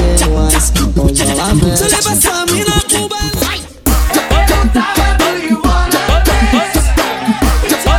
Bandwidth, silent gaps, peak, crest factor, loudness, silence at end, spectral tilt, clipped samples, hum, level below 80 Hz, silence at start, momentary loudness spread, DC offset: 18.5 kHz; none; 0 dBFS; 10 dB; -12 LUFS; 0 s; -4 dB/octave; under 0.1%; none; -14 dBFS; 0 s; 4 LU; under 0.1%